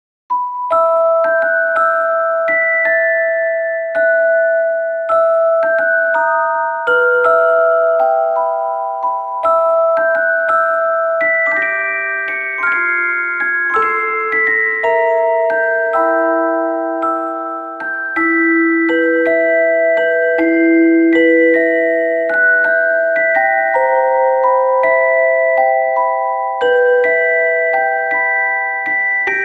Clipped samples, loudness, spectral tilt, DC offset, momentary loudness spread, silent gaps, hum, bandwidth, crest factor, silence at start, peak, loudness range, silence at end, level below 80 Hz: under 0.1%; -13 LUFS; -5.5 dB/octave; under 0.1%; 6 LU; none; none; 4.6 kHz; 12 dB; 0.3 s; -2 dBFS; 3 LU; 0 s; -64 dBFS